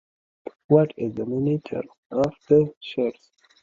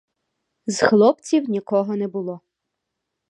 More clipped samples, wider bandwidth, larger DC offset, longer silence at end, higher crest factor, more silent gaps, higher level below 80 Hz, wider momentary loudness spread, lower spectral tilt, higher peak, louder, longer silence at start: neither; second, 7.2 kHz vs 11 kHz; neither; second, 0.5 s vs 0.9 s; about the same, 20 dB vs 20 dB; first, 1.98-2.10 s, 2.77-2.81 s vs none; first, -60 dBFS vs -68 dBFS; second, 14 LU vs 17 LU; first, -9 dB/octave vs -5 dB/octave; about the same, -4 dBFS vs -2 dBFS; second, -24 LUFS vs -20 LUFS; about the same, 0.7 s vs 0.65 s